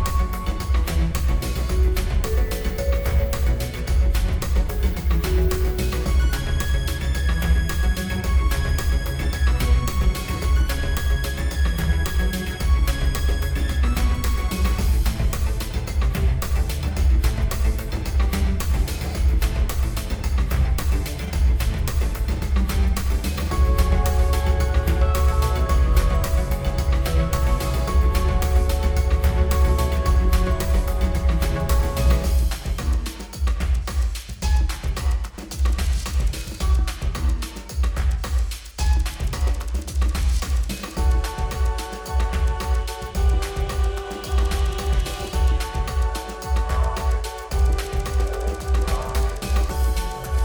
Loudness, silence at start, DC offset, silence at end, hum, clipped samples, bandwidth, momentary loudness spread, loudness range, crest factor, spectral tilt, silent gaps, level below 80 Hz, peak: -23 LUFS; 0 s; under 0.1%; 0 s; none; under 0.1%; over 20 kHz; 5 LU; 4 LU; 14 dB; -5.5 dB/octave; none; -20 dBFS; -6 dBFS